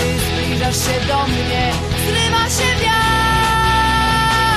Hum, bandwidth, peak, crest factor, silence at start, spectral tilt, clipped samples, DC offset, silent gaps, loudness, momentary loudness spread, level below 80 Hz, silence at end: none; 15.5 kHz; -4 dBFS; 12 dB; 0 s; -3.5 dB/octave; under 0.1%; under 0.1%; none; -15 LUFS; 4 LU; -26 dBFS; 0 s